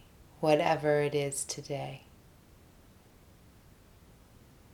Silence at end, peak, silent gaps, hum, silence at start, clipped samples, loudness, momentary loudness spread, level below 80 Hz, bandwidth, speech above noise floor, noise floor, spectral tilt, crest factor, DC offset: 2.75 s; -12 dBFS; none; none; 0.4 s; under 0.1%; -30 LUFS; 13 LU; -62 dBFS; 19.5 kHz; 29 dB; -58 dBFS; -4.5 dB/octave; 22 dB; under 0.1%